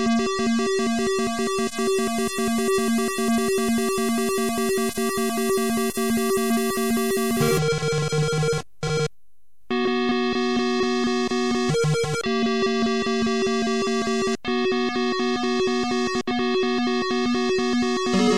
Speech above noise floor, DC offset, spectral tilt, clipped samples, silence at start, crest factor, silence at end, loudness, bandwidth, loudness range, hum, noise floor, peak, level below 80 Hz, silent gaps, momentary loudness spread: 47 dB; 1%; -4.5 dB/octave; under 0.1%; 0 s; 12 dB; 0 s; -23 LUFS; 16 kHz; 1 LU; none; -70 dBFS; -10 dBFS; -50 dBFS; none; 2 LU